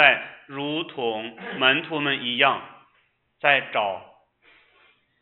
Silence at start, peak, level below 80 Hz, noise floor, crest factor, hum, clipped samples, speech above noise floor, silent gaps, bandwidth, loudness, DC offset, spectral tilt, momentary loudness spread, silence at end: 0 s; -2 dBFS; -72 dBFS; -66 dBFS; 24 dB; none; under 0.1%; 43 dB; none; 4.3 kHz; -23 LUFS; under 0.1%; -7.5 dB/octave; 12 LU; 1.15 s